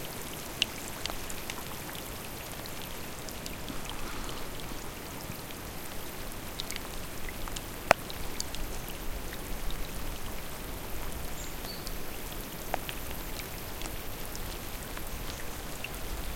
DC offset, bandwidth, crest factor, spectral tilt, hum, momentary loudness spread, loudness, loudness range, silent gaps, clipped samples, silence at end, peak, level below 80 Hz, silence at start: under 0.1%; 17 kHz; 32 dB; -3 dB/octave; none; 4 LU; -37 LUFS; 5 LU; none; under 0.1%; 0 s; -4 dBFS; -42 dBFS; 0 s